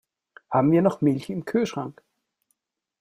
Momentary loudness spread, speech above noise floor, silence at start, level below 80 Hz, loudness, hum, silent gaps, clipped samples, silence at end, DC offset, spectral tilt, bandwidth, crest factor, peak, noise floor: 11 LU; 53 dB; 0.5 s; -64 dBFS; -23 LUFS; none; none; under 0.1%; 1.1 s; under 0.1%; -8 dB/octave; 15.5 kHz; 20 dB; -6 dBFS; -75 dBFS